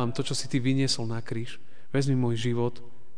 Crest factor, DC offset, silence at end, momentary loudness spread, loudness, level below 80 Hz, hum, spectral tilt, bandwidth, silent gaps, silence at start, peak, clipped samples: 14 dB; 3%; 0.3 s; 10 LU; -28 LUFS; -62 dBFS; none; -5.5 dB/octave; 10 kHz; none; 0 s; -14 dBFS; under 0.1%